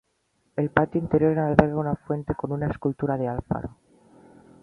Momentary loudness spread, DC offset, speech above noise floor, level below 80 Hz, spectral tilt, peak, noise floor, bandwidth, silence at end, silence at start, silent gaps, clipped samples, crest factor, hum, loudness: 10 LU; under 0.1%; 46 dB; -46 dBFS; -10 dB/octave; 0 dBFS; -70 dBFS; 5.8 kHz; 0.95 s; 0.55 s; none; under 0.1%; 24 dB; none; -25 LUFS